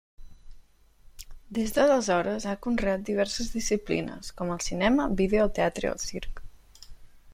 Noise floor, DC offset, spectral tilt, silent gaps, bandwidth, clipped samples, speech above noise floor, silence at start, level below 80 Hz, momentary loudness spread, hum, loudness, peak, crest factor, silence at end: -55 dBFS; under 0.1%; -4.5 dB/octave; none; 16 kHz; under 0.1%; 28 dB; 0.2 s; -42 dBFS; 12 LU; none; -27 LUFS; -8 dBFS; 20 dB; 0 s